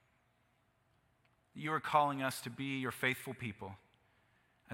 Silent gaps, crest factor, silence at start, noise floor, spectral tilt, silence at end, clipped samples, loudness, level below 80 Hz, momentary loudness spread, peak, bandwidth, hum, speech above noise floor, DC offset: none; 26 dB; 1.55 s; -75 dBFS; -4.5 dB/octave; 0 s; under 0.1%; -37 LUFS; -78 dBFS; 16 LU; -14 dBFS; 16.5 kHz; none; 38 dB; under 0.1%